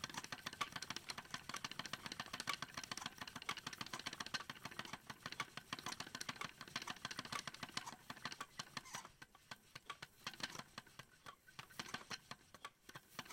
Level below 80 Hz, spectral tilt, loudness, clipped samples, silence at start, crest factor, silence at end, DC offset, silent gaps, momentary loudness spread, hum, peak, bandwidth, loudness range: -76 dBFS; -1.5 dB/octave; -49 LUFS; under 0.1%; 0 s; 26 dB; 0 s; under 0.1%; none; 11 LU; none; -24 dBFS; 16.5 kHz; 5 LU